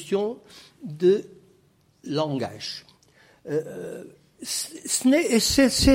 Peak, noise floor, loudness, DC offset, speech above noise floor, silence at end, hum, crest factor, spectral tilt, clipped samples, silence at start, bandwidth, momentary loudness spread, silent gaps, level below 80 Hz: -6 dBFS; -61 dBFS; -24 LUFS; under 0.1%; 38 dB; 0 s; none; 20 dB; -4 dB/octave; under 0.1%; 0 s; 16.5 kHz; 21 LU; none; -42 dBFS